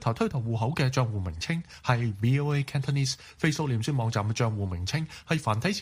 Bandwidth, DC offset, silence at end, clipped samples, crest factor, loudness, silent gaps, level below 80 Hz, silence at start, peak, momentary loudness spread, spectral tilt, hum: 15.5 kHz; under 0.1%; 0 s; under 0.1%; 20 dB; -28 LUFS; none; -52 dBFS; 0 s; -8 dBFS; 5 LU; -5.5 dB/octave; none